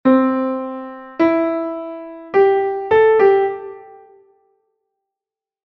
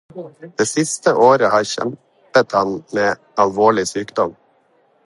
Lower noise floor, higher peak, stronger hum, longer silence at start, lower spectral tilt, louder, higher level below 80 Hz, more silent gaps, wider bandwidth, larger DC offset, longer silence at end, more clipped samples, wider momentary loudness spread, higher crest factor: first, -89 dBFS vs -58 dBFS; about the same, -2 dBFS vs 0 dBFS; neither; about the same, 0.05 s vs 0.15 s; first, -7.5 dB/octave vs -4 dB/octave; about the same, -16 LUFS vs -17 LUFS; about the same, -58 dBFS vs -60 dBFS; neither; second, 5.8 kHz vs 11.5 kHz; neither; first, 1.8 s vs 0.75 s; neither; first, 18 LU vs 11 LU; about the same, 16 dB vs 18 dB